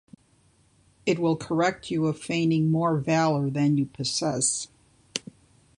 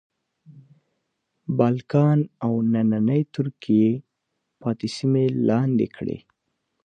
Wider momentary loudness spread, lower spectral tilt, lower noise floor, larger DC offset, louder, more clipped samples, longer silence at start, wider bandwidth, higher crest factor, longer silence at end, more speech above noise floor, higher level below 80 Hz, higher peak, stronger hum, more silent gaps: about the same, 11 LU vs 12 LU; second, -5 dB/octave vs -8.5 dB/octave; second, -62 dBFS vs -78 dBFS; neither; second, -25 LUFS vs -22 LUFS; neither; first, 1.05 s vs 0.5 s; first, 11 kHz vs 9.2 kHz; about the same, 20 dB vs 18 dB; about the same, 0.6 s vs 0.7 s; second, 38 dB vs 57 dB; about the same, -62 dBFS vs -62 dBFS; about the same, -6 dBFS vs -4 dBFS; neither; neither